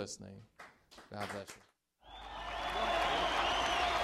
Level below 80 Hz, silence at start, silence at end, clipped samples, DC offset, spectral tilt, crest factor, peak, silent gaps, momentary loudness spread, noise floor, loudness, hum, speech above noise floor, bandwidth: -54 dBFS; 0 s; 0 s; under 0.1%; under 0.1%; -2.5 dB/octave; 18 dB; -20 dBFS; none; 23 LU; -58 dBFS; -35 LUFS; none; 12 dB; 15 kHz